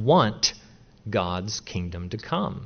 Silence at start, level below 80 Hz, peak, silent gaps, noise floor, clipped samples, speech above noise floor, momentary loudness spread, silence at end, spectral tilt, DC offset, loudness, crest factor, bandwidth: 0 s; -50 dBFS; -6 dBFS; none; -51 dBFS; under 0.1%; 26 dB; 13 LU; 0 s; -4.5 dB/octave; under 0.1%; -26 LUFS; 20 dB; 6.8 kHz